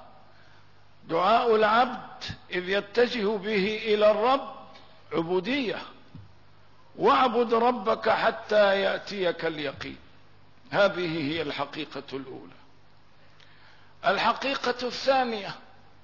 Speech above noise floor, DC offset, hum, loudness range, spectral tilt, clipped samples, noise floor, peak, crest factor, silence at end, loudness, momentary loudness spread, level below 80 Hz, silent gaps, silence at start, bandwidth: 34 dB; 0.3%; none; 6 LU; -5 dB/octave; under 0.1%; -59 dBFS; -12 dBFS; 16 dB; 0.45 s; -26 LUFS; 16 LU; -64 dBFS; none; 0 s; 6 kHz